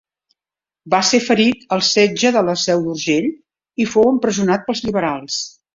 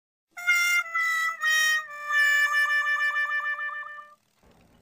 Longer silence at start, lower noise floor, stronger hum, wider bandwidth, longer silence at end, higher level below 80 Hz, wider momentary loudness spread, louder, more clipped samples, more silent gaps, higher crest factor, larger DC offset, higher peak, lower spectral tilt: first, 0.85 s vs 0.35 s; first, -90 dBFS vs -61 dBFS; neither; second, 7.8 kHz vs 15.5 kHz; second, 0.25 s vs 0.75 s; first, -56 dBFS vs -78 dBFS; about the same, 9 LU vs 11 LU; first, -17 LUFS vs -23 LUFS; neither; neither; about the same, 16 dB vs 14 dB; neither; first, -2 dBFS vs -12 dBFS; first, -3.5 dB/octave vs 3.5 dB/octave